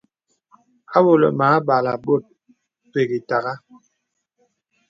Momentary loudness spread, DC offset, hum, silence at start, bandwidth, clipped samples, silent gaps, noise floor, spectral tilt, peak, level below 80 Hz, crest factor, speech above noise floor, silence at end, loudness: 11 LU; under 0.1%; none; 0.9 s; 7.4 kHz; under 0.1%; none; -76 dBFS; -8.5 dB/octave; 0 dBFS; -68 dBFS; 20 dB; 58 dB; 1.3 s; -19 LUFS